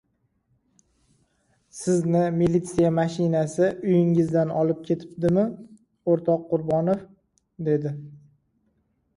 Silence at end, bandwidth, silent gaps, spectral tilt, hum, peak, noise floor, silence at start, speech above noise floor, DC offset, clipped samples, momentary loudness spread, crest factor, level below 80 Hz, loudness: 1 s; 11.5 kHz; none; -8 dB/octave; none; -8 dBFS; -70 dBFS; 1.75 s; 48 dB; under 0.1%; under 0.1%; 10 LU; 16 dB; -56 dBFS; -24 LUFS